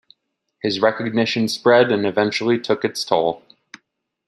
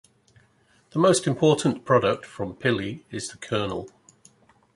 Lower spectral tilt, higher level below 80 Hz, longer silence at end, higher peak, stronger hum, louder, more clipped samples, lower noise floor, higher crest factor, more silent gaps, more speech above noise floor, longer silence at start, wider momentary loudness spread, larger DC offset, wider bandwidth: about the same, -5 dB/octave vs -5 dB/octave; second, -66 dBFS vs -58 dBFS; about the same, 0.9 s vs 0.85 s; first, -2 dBFS vs -6 dBFS; neither; first, -19 LUFS vs -24 LUFS; neither; first, -71 dBFS vs -62 dBFS; about the same, 18 dB vs 20 dB; neither; first, 52 dB vs 38 dB; second, 0.65 s vs 0.95 s; second, 9 LU vs 14 LU; neither; first, 14 kHz vs 11.5 kHz